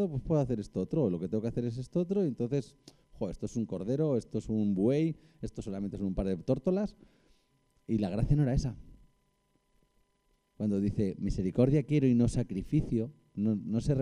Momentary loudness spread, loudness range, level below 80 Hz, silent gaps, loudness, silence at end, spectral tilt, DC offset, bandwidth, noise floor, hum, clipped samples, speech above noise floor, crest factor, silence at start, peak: 11 LU; 5 LU; -46 dBFS; none; -32 LUFS; 0 s; -8.5 dB/octave; under 0.1%; 10.5 kHz; -74 dBFS; none; under 0.1%; 43 dB; 18 dB; 0 s; -14 dBFS